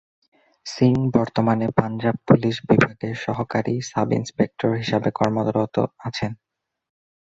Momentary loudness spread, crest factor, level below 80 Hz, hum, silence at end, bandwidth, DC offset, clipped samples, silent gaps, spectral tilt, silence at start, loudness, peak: 10 LU; 20 dB; -52 dBFS; none; 0.95 s; 8 kHz; under 0.1%; under 0.1%; none; -7 dB/octave; 0.65 s; -22 LUFS; -2 dBFS